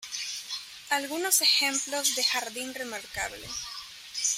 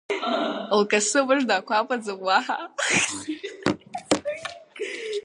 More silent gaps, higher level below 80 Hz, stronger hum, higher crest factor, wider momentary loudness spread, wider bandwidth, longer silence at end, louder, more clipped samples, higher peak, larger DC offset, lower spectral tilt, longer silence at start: neither; about the same, -64 dBFS vs -62 dBFS; neither; about the same, 22 dB vs 20 dB; about the same, 15 LU vs 13 LU; first, 16 kHz vs 11.5 kHz; about the same, 0 s vs 0.05 s; second, -27 LUFS vs -24 LUFS; neither; second, -8 dBFS vs -4 dBFS; neither; second, 1 dB/octave vs -2.5 dB/octave; about the same, 0 s vs 0.1 s